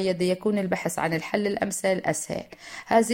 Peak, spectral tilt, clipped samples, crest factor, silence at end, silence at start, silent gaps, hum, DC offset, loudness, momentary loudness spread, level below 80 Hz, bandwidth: -6 dBFS; -4.5 dB/octave; under 0.1%; 18 dB; 0 s; 0 s; none; none; under 0.1%; -26 LUFS; 10 LU; -60 dBFS; 16.5 kHz